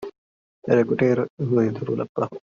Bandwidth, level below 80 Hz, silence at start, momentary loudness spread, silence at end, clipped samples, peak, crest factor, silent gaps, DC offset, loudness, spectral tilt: 7.2 kHz; -62 dBFS; 0 s; 9 LU; 0.2 s; under 0.1%; -4 dBFS; 18 dB; 0.18-0.62 s, 1.30-1.37 s, 2.09-2.15 s; under 0.1%; -22 LUFS; -8 dB/octave